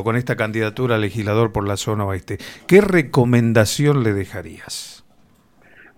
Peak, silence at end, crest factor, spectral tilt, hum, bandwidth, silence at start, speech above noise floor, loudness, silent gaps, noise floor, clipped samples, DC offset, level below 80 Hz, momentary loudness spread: 0 dBFS; 1 s; 18 dB; -6 dB/octave; none; 16.5 kHz; 0 s; 35 dB; -18 LUFS; none; -54 dBFS; under 0.1%; under 0.1%; -46 dBFS; 16 LU